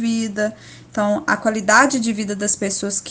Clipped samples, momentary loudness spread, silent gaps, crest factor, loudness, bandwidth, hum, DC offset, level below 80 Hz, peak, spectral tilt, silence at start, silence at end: under 0.1%; 10 LU; none; 20 dB; -19 LUFS; 10 kHz; none; under 0.1%; -56 dBFS; 0 dBFS; -3 dB/octave; 0 s; 0 s